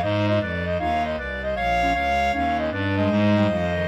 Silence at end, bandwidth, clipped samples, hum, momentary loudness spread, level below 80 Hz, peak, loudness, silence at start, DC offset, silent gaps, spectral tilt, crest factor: 0 s; 14 kHz; under 0.1%; none; 6 LU; -38 dBFS; -8 dBFS; -22 LUFS; 0 s; under 0.1%; none; -7 dB/octave; 14 dB